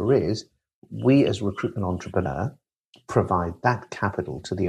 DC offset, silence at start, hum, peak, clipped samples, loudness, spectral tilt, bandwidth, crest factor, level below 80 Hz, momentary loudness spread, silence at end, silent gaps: under 0.1%; 0 s; none; -6 dBFS; under 0.1%; -25 LUFS; -7 dB/octave; 10.5 kHz; 18 dB; -50 dBFS; 11 LU; 0 s; 0.74-0.82 s, 2.76-2.92 s